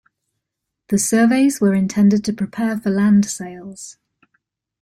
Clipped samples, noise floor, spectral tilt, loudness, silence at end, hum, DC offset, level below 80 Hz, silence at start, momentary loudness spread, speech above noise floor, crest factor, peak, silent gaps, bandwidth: under 0.1%; -80 dBFS; -5.5 dB/octave; -17 LUFS; 0.9 s; none; under 0.1%; -58 dBFS; 0.9 s; 18 LU; 63 dB; 14 dB; -6 dBFS; none; 13.5 kHz